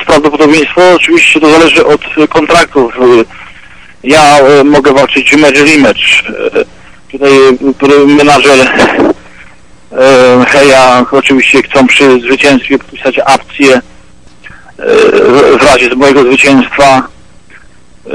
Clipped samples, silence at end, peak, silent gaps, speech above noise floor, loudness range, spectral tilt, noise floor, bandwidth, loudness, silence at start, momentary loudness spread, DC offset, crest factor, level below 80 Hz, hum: 4%; 0 s; 0 dBFS; none; 34 dB; 2 LU; -4 dB/octave; -38 dBFS; 13.5 kHz; -4 LUFS; 0 s; 8 LU; 1%; 6 dB; -36 dBFS; none